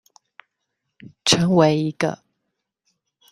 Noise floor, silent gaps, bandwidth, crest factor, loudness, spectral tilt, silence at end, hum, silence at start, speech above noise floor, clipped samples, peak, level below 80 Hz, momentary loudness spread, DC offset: -78 dBFS; none; 14.5 kHz; 22 dB; -19 LUFS; -4.5 dB/octave; 1.15 s; none; 1.05 s; 59 dB; under 0.1%; -2 dBFS; -58 dBFS; 10 LU; under 0.1%